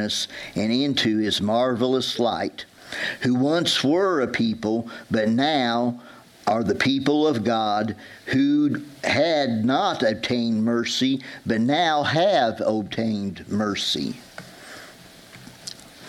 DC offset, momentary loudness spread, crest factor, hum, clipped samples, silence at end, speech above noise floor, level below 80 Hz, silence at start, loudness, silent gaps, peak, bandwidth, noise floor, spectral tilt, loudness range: under 0.1%; 12 LU; 16 dB; none; under 0.1%; 0 s; 23 dB; -60 dBFS; 0 s; -22 LUFS; none; -6 dBFS; 14.5 kHz; -46 dBFS; -5 dB/octave; 2 LU